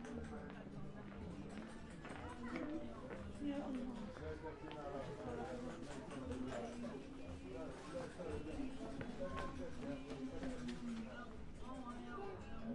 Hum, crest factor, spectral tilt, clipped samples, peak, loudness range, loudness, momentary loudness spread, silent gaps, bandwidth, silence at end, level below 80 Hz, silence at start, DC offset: none; 20 dB; -6.5 dB/octave; under 0.1%; -28 dBFS; 1 LU; -49 LUFS; 6 LU; none; 11 kHz; 0 s; -60 dBFS; 0 s; under 0.1%